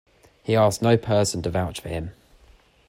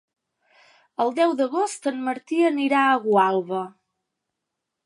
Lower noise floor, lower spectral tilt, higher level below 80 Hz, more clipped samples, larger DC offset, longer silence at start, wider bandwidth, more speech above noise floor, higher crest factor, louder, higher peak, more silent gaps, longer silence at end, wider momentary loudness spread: second, -55 dBFS vs -82 dBFS; about the same, -5.5 dB/octave vs -4.5 dB/octave; first, -48 dBFS vs -82 dBFS; neither; neither; second, 0.45 s vs 1 s; first, 16 kHz vs 11.5 kHz; second, 33 dB vs 61 dB; about the same, 18 dB vs 18 dB; about the same, -23 LUFS vs -22 LUFS; about the same, -6 dBFS vs -6 dBFS; neither; second, 0.75 s vs 1.15 s; first, 14 LU vs 11 LU